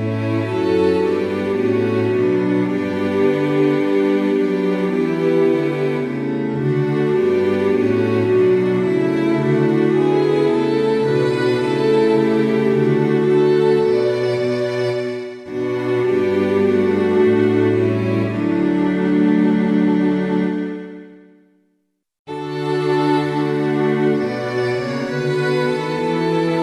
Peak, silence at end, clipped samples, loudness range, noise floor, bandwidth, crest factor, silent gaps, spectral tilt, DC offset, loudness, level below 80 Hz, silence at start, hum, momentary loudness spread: -4 dBFS; 0 s; under 0.1%; 4 LU; -68 dBFS; 10.5 kHz; 12 dB; 22.19-22.25 s; -8 dB/octave; under 0.1%; -17 LUFS; -56 dBFS; 0 s; none; 6 LU